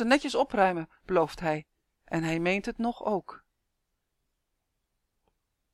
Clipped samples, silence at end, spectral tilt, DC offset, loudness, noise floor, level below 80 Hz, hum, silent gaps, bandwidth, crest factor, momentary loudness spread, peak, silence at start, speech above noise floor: under 0.1%; 2.35 s; -5.5 dB/octave; under 0.1%; -29 LUFS; -80 dBFS; -58 dBFS; none; none; 14 kHz; 20 dB; 10 LU; -10 dBFS; 0 s; 52 dB